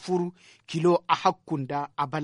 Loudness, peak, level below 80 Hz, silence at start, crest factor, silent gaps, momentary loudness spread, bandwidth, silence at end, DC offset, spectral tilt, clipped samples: -27 LUFS; -6 dBFS; -70 dBFS; 0 s; 20 dB; none; 11 LU; 11 kHz; 0 s; under 0.1%; -6.5 dB/octave; under 0.1%